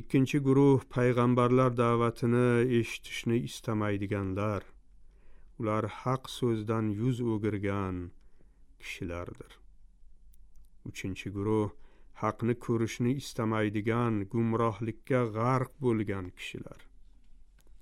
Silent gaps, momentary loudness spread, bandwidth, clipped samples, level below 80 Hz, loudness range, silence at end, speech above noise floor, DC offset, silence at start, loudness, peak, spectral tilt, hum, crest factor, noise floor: none; 14 LU; 14.5 kHz; under 0.1%; -56 dBFS; 10 LU; 0.1 s; 25 dB; under 0.1%; 0 s; -30 LUFS; -14 dBFS; -7 dB/octave; none; 16 dB; -55 dBFS